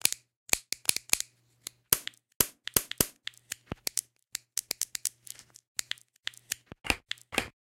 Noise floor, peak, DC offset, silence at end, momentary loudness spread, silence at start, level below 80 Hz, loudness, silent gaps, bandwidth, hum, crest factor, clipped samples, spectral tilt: -50 dBFS; -2 dBFS; under 0.1%; 0.2 s; 15 LU; 0.05 s; -56 dBFS; -31 LUFS; 0.37-0.46 s, 2.35-2.40 s, 5.68-5.75 s; 17 kHz; none; 32 dB; under 0.1%; -0.5 dB/octave